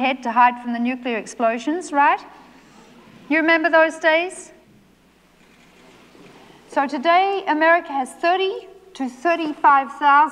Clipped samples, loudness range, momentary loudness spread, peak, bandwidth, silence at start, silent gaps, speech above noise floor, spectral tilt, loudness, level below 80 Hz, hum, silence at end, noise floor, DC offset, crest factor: under 0.1%; 5 LU; 11 LU; -4 dBFS; 11.5 kHz; 0 s; none; 36 dB; -3 dB/octave; -19 LUFS; -66 dBFS; 60 Hz at -65 dBFS; 0 s; -55 dBFS; under 0.1%; 16 dB